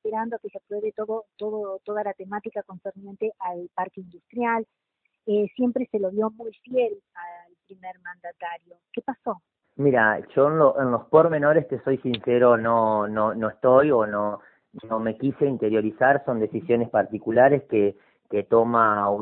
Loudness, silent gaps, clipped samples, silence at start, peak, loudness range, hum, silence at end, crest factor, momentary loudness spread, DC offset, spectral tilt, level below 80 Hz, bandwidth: -23 LUFS; none; under 0.1%; 0.05 s; -4 dBFS; 11 LU; none; 0 s; 20 dB; 19 LU; under 0.1%; -11 dB/octave; -66 dBFS; 4.4 kHz